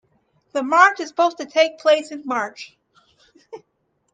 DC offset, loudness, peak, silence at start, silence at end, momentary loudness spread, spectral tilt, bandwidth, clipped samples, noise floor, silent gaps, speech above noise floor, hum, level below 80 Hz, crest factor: under 0.1%; -19 LUFS; 0 dBFS; 0.55 s; 0.55 s; 15 LU; -2 dB/octave; 9.2 kHz; under 0.1%; -70 dBFS; none; 51 dB; none; -76 dBFS; 22 dB